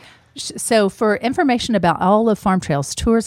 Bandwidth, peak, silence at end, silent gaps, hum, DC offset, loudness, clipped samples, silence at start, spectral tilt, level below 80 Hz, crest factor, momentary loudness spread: 15 kHz; -4 dBFS; 0 s; none; none; under 0.1%; -17 LUFS; under 0.1%; 0.35 s; -5 dB/octave; -40 dBFS; 14 dB; 7 LU